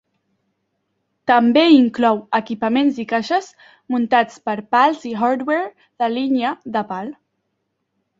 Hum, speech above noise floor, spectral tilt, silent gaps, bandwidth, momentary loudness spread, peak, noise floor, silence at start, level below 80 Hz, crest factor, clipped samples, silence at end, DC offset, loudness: none; 55 dB; -5.5 dB/octave; none; 7.6 kHz; 12 LU; -2 dBFS; -73 dBFS; 1.25 s; -66 dBFS; 18 dB; under 0.1%; 1.1 s; under 0.1%; -18 LUFS